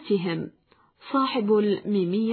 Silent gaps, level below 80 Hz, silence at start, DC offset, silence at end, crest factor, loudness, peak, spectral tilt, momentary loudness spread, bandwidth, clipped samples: none; -72 dBFS; 0 s; under 0.1%; 0 s; 12 dB; -25 LUFS; -12 dBFS; -10.5 dB/octave; 9 LU; 4.5 kHz; under 0.1%